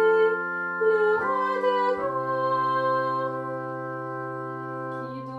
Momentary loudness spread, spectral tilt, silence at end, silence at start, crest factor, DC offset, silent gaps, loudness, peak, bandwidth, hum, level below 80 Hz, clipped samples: 11 LU; -7 dB/octave; 0 s; 0 s; 14 dB; under 0.1%; none; -26 LUFS; -12 dBFS; 7.6 kHz; none; -70 dBFS; under 0.1%